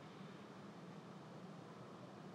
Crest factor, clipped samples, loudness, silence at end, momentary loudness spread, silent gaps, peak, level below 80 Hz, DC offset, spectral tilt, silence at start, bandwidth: 12 dB; under 0.1%; -56 LUFS; 0 s; 1 LU; none; -44 dBFS; under -90 dBFS; under 0.1%; -6.5 dB/octave; 0 s; 12 kHz